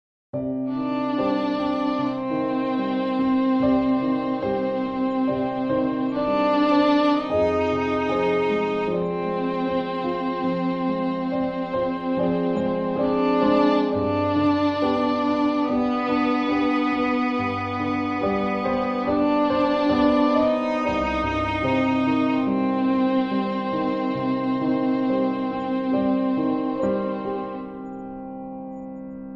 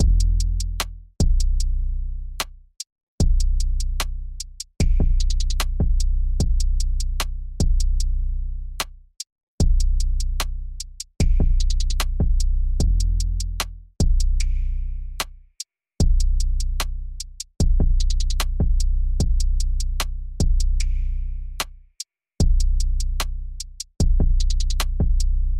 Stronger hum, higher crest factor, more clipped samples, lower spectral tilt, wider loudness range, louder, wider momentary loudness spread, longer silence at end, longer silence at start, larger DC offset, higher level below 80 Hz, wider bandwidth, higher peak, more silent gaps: neither; about the same, 14 dB vs 14 dB; neither; first, -7.5 dB/octave vs -4.5 dB/octave; about the same, 3 LU vs 3 LU; about the same, -23 LUFS vs -25 LUFS; second, 6 LU vs 12 LU; about the same, 0 s vs 0 s; first, 0.35 s vs 0 s; neither; second, -50 dBFS vs -20 dBFS; second, 6.8 kHz vs 14.5 kHz; about the same, -8 dBFS vs -6 dBFS; second, none vs 2.92-2.96 s, 3.03-3.18 s, 9.32-9.36 s, 9.43-9.58 s